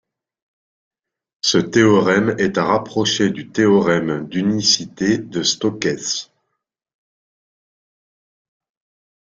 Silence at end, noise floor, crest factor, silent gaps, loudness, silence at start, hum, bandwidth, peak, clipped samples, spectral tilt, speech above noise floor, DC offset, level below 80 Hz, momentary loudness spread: 3 s; -77 dBFS; 18 dB; none; -17 LUFS; 1.45 s; none; 7.8 kHz; -2 dBFS; under 0.1%; -4 dB/octave; 60 dB; under 0.1%; -58 dBFS; 7 LU